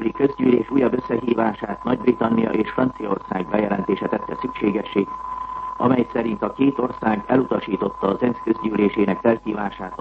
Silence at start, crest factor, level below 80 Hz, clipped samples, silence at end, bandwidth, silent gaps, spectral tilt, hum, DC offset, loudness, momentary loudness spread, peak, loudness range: 0 s; 18 dB; -50 dBFS; under 0.1%; 0.05 s; 5.6 kHz; none; -9 dB/octave; none; under 0.1%; -22 LUFS; 8 LU; -4 dBFS; 2 LU